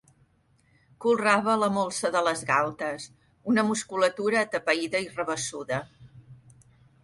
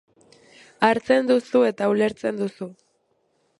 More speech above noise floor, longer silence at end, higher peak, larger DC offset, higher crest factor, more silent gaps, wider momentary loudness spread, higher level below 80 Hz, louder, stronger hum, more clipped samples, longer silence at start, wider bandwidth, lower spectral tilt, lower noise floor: second, 39 dB vs 47 dB; second, 0.7 s vs 0.85 s; second, -8 dBFS vs -2 dBFS; neither; about the same, 20 dB vs 20 dB; neither; about the same, 11 LU vs 11 LU; about the same, -66 dBFS vs -66 dBFS; second, -26 LUFS vs -21 LUFS; neither; neither; first, 1 s vs 0.8 s; about the same, 11.5 kHz vs 11.5 kHz; second, -4 dB/octave vs -6 dB/octave; about the same, -65 dBFS vs -68 dBFS